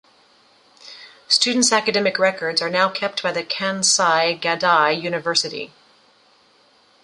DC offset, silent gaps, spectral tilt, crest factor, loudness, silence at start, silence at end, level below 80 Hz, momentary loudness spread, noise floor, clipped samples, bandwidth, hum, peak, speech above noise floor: under 0.1%; none; -1.5 dB/octave; 18 dB; -18 LUFS; 0.85 s; 1.4 s; -70 dBFS; 9 LU; -56 dBFS; under 0.1%; 11.5 kHz; none; -2 dBFS; 36 dB